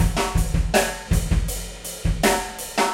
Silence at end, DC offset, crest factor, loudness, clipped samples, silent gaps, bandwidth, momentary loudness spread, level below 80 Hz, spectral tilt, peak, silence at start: 0 s; under 0.1%; 18 dB; -23 LUFS; under 0.1%; none; 16.5 kHz; 8 LU; -26 dBFS; -4 dB/octave; -4 dBFS; 0 s